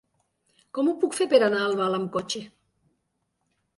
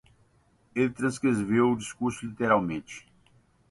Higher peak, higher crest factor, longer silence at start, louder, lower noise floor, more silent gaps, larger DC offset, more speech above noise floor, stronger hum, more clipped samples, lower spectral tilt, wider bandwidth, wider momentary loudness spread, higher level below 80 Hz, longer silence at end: first, -6 dBFS vs -10 dBFS; about the same, 20 dB vs 20 dB; about the same, 0.75 s vs 0.75 s; first, -24 LUFS vs -27 LUFS; first, -76 dBFS vs -65 dBFS; neither; neither; first, 52 dB vs 38 dB; neither; neither; second, -4.5 dB/octave vs -6 dB/octave; about the same, 11.5 kHz vs 11.5 kHz; about the same, 13 LU vs 12 LU; second, -72 dBFS vs -60 dBFS; first, 1.3 s vs 0.7 s